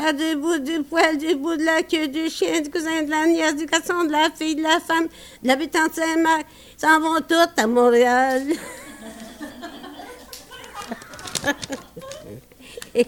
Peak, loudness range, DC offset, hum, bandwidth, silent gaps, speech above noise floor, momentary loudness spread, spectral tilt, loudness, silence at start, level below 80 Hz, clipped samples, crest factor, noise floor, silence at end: -4 dBFS; 13 LU; under 0.1%; none; 17.5 kHz; none; 21 dB; 20 LU; -2.5 dB/octave; -20 LUFS; 0 s; -56 dBFS; under 0.1%; 18 dB; -41 dBFS; 0 s